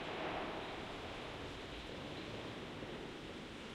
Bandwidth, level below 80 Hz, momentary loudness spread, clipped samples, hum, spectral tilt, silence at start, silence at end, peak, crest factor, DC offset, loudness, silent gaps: 16 kHz; -60 dBFS; 6 LU; under 0.1%; none; -5 dB/octave; 0 s; 0 s; -32 dBFS; 14 dB; under 0.1%; -46 LUFS; none